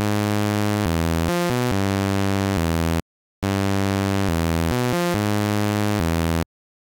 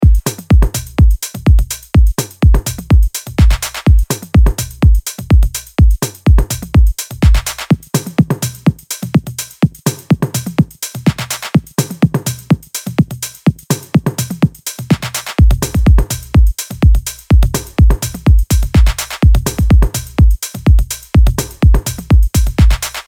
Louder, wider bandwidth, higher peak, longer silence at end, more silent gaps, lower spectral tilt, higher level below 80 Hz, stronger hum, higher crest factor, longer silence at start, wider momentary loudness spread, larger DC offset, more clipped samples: second, -22 LUFS vs -14 LUFS; about the same, 17 kHz vs 18.5 kHz; second, -10 dBFS vs 0 dBFS; first, 0.45 s vs 0.05 s; first, 3.02-3.42 s vs none; about the same, -6 dB/octave vs -5.5 dB/octave; second, -36 dBFS vs -14 dBFS; neither; about the same, 12 dB vs 12 dB; about the same, 0 s vs 0 s; about the same, 3 LU vs 5 LU; neither; neither